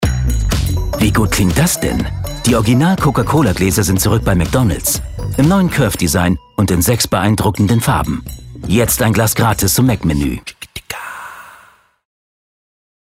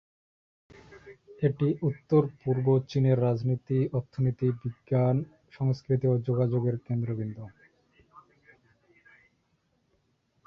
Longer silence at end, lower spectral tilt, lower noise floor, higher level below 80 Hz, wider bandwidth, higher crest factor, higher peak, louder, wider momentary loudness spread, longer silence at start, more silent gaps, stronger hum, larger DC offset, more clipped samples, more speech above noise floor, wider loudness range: second, 1.5 s vs 2.3 s; second, -5 dB/octave vs -10.5 dB/octave; second, -47 dBFS vs -72 dBFS; first, -26 dBFS vs -62 dBFS; first, 16.5 kHz vs 6.2 kHz; about the same, 14 dB vs 18 dB; first, -2 dBFS vs -10 dBFS; first, -14 LUFS vs -28 LUFS; first, 13 LU vs 7 LU; second, 0 s vs 0.9 s; neither; neither; neither; neither; second, 34 dB vs 45 dB; second, 3 LU vs 8 LU